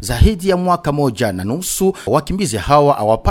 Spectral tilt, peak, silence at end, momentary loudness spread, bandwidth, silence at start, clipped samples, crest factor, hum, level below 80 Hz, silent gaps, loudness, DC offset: -5.5 dB/octave; 0 dBFS; 0 s; 7 LU; 17.5 kHz; 0 s; under 0.1%; 14 dB; none; -24 dBFS; none; -16 LUFS; under 0.1%